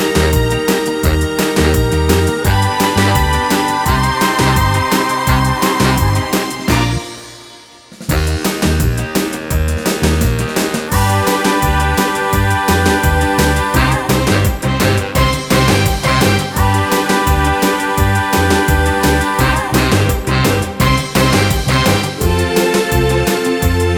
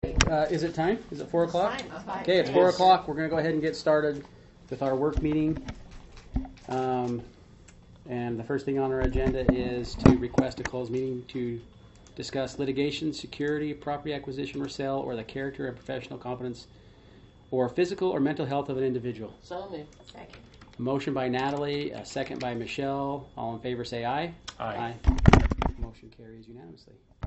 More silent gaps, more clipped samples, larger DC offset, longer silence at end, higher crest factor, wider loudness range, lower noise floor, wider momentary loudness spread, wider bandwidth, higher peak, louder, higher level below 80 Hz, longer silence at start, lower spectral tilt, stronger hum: neither; neither; neither; about the same, 0 s vs 0 s; second, 14 dB vs 28 dB; second, 3 LU vs 8 LU; second, -38 dBFS vs -53 dBFS; second, 4 LU vs 17 LU; first, over 20 kHz vs 8.2 kHz; about the same, 0 dBFS vs 0 dBFS; first, -14 LUFS vs -28 LUFS; first, -22 dBFS vs -38 dBFS; about the same, 0 s vs 0.05 s; about the same, -5 dB/octave vs -6 dB/octave; neither